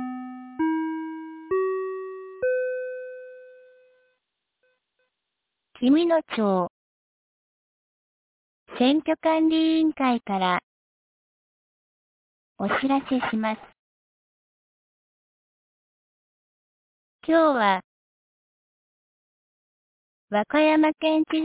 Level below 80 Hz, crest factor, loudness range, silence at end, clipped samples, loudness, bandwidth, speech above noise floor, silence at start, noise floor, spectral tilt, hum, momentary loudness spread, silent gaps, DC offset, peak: -68 dBFS; 18 dB; 9 LU; 0 s; under 0.1%; -24 LUFS; 4 kHz; 61 dB; 0 s; -82 dBFS; -9.5 dB/octave; none; 16 LU; 6.70-8.66 s, 10.63-12.56 s, 13.79-17.19 s, 17.84-20.28 s; under 0.1%; -8 dBFS